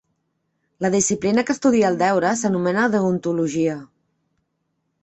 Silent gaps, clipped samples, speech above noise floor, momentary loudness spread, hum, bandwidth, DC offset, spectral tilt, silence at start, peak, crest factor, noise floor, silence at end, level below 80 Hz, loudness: none; under 0.1%; 54 dB; 6 LU; none; 8.2 kHz; under 0.1%; -5 dB/octave; 0.8 s; -6 dBFS; 14 dB; -73 dBFS; 1.15 s; -60 dBFS; -20 LUFS